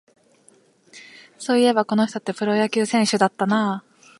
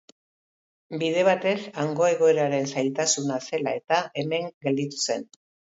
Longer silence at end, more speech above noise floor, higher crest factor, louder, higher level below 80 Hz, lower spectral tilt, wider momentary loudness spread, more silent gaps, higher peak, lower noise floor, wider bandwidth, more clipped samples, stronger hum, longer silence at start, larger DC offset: second, 0.4 s vs 0.55 s; second, 37 dB vs over 66 dB; about the same, 20 dB vs 18 dB; first, -20 LUFS vs -25 LUFS; about the same, -74 dBFS vs -76 dBFS; about the same, -4.5 dB/octave vs -4 dB/octave; about the same, 10 LU vs 8 LU; second, none vs 4.54-4.61 s; first, -2 dBFS vs -8 dBFS; second, -57 dBFS vs under -90 dBFS; first, 11.5 kHz vs 8 kHz; neither; neither; about the same, 0.95 s vs 0.9 s; neither